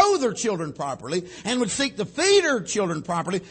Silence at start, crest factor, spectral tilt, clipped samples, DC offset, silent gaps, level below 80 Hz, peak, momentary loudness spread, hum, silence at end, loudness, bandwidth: 0 s; 18 dB; -3.5 dB/octave; under 0.1%; under 0.1%; none; -60 dBFS; -6 dBFS; 10 LU; none; 0 s; -24 LUFS; 8.8 kHz